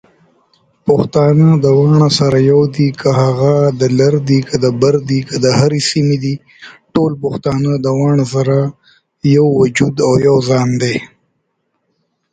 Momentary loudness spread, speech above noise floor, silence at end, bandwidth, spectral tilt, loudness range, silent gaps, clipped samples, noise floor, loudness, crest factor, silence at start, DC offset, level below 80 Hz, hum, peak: 7 LU; 55 dB; 1.25 s; 9.2 kHz; -6.5 dB/octave; 4 LU; none; under 0.1%; -67 dBFS; -12 LUFS; 12 dB; 0.85 s; under 0.1%; -46 dBFS; none; 0 dBFS